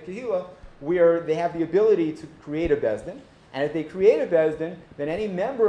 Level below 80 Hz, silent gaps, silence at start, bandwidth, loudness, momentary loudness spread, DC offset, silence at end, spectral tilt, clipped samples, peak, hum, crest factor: -50 dBFS; none; 0 s; 9.4 kHz; -24 LUFS; 16 LU; under 0.1%; 0 s; -7.5 dB/octave; under 0.1%; -6 dBFS; none; 18 dB